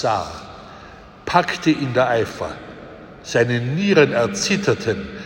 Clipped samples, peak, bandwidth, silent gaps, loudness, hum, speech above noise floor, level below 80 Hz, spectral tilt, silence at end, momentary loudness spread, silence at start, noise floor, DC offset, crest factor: under 0.1%; -2 dBFS; 16.5 kHz; none; -19 LUFS; none; 22 dB; -50 dBFS; -5 dB/octave; 0 s; 22 LU; 0 s; -41 dBFS; under 0.1%; 20 dB